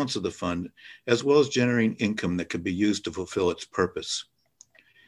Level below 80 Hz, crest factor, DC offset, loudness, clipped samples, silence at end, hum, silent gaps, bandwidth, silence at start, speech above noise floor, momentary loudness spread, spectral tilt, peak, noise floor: -52 dBFS; 18 dB; under 0.1%; -26 LUFS; under 0.1%; 0.85 s; none; none; 11.5 kHz; 0 s; 32 dB; 10 LU; -5 dB/octave; -8 dBFS; -58 dBFS